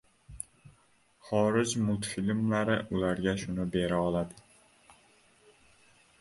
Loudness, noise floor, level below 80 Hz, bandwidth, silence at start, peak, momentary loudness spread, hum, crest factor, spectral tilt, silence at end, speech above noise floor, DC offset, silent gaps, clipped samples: -30 LUFS; -66 dBFS; -56 dBFS; 11.5 kHz; 0.3 s; -12 dBFS; 14 LU; none; 20 dB; -5.5 dB/octave; 1.8 s; 36 dB; under 0.1%; none; under 0.1%